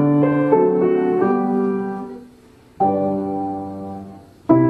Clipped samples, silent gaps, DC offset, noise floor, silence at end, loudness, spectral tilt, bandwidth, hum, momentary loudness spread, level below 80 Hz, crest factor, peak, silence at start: under 0.1%; none; under 0.1%; -47 dBFS; 0 s; -19 LUFS; -10.5 dB/octave; 4.6 kHz; none; 17 LU; -58 dBFS; 16 dB; -2 dBFS; 0 s